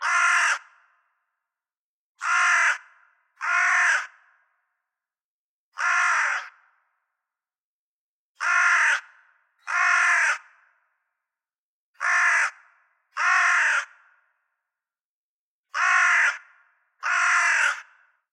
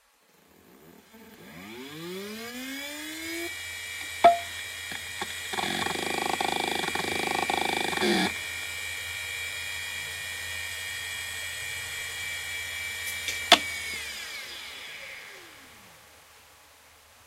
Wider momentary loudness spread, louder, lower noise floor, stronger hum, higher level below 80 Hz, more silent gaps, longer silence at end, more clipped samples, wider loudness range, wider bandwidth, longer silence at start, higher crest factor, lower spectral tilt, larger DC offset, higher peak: second, 13 LU vs 17 LU; first, -21 LUFS vs -29 LUFS; first, under -90 dBFS vs -62 dBFS; neither; second, under -90 dBFS vs -62 dBFS; first, 1.77-2.15 s, 5.24-5.72 s, 7.61-8.35 s, 11.58-11.94 s, 15.04-15.63 s vs none; first, 0.5 s vs 0.05 s; neither; second, 5 LU vs 10 LU; second, 12 kHz vs 16 kHz; second, 0 s vs 0.65 s; second, 16 dB vs 28 dB; second, 8.5 dB/octave vs -2 dB/octave; neither; second, -10 dBFS vs -4 dBFS